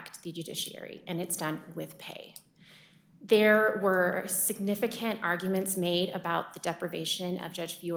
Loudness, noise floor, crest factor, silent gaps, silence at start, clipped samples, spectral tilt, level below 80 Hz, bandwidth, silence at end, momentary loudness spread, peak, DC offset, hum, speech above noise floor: -30 LUFS; -58 dBFS; 20 dB; none; 0 s; under 0.1%; -3.5 dB/octave; -74 dBFS; over 20 kHz; 0 s; 17 LU; -10 dBFS; under 0.1%; none; 28 dB